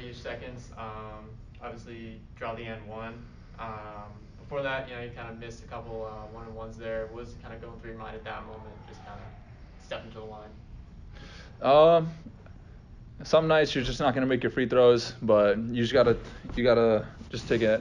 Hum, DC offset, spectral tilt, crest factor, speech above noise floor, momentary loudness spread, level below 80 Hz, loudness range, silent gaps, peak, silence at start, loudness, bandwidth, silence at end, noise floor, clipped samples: none; under 0.1%; -6 dB/octave; 20 dB; 20 dB; 24 LU; -48 dBFS; 18 LU; none; -10 dBFS; 0 s; -26 LUFS; 9.6 kHz; 0 s; -48 dBFS; under 0.1%